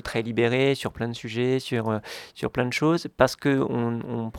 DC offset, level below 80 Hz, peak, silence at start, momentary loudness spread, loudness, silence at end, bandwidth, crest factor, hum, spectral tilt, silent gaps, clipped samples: under 0.1%; -52 dBFS; -2 dBFS; 0.05 s; 9 LU; -25 LUFS; 0 s; 17 kHz; 22 dB; none; -6 dB/octave; none; under 0.1%